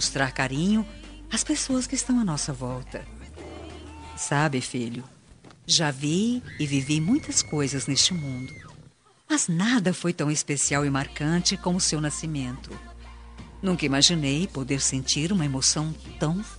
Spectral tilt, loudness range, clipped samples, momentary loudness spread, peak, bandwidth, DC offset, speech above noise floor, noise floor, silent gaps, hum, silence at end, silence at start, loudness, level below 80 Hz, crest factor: -3.5 dB/octave; 5 LU; under 0.1%; 19 LU; -4 dBFS; 10.5 kHz; under 0.1%; 29 dB; -54 dBFS; none; none; 0 s; 0 s; -25 LUFS; -46 dBFS; 24 dB